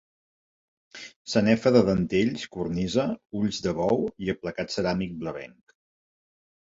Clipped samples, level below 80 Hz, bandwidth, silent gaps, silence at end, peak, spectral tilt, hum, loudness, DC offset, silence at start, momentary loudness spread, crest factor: under 0.1%; -52 dBFS; 7.8 kHz; 1.16-1.25 s; 1.2 s; -6 dBFS; -6 dB/octave; none; -26 LUFS; under 0.1%; 0.95 s; 16 LU; 22 dB